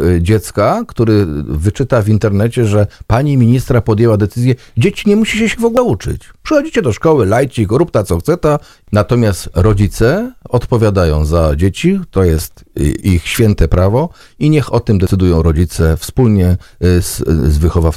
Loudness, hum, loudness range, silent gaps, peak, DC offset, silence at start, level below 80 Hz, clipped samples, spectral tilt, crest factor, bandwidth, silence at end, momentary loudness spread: -13 LUFS; none; 1 LU; none; 0 dBFS; under 0.1%; 0 s; -24 dBFS; 0.5%; -7 dB/octave; 12 dB; 15.5 kHz; 0 s; 5 LU